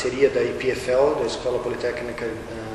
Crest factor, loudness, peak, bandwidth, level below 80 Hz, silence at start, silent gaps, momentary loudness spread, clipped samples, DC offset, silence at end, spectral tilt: 18 dB; -23 LUFS; -6 dBFS; 12.5 kHz; -46 dBFS; 0 s; none; 10 LU; under 0.1%; under 0.1%; 0 s; -5 dB/octave